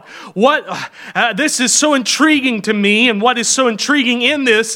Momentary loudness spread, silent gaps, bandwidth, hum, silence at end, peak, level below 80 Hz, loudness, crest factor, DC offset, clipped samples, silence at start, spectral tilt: 7 LU; none; 17 kHz; none; 0 s; 0 dBFS; -68 dBFS; -13 LUFS; 14 dB; under 0.1%; under 0.1%; 0.1 s; -2 dB/octave